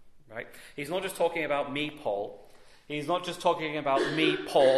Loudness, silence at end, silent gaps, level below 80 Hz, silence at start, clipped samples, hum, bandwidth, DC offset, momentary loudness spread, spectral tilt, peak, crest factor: -29 LUFS; 0 s; none; -64 dBFS; 0 s; under 0.1%; none; 13.5 kHz; under 0.1%; 16 LU; -4.5 dB/octave; -10 dBFS; 18 dB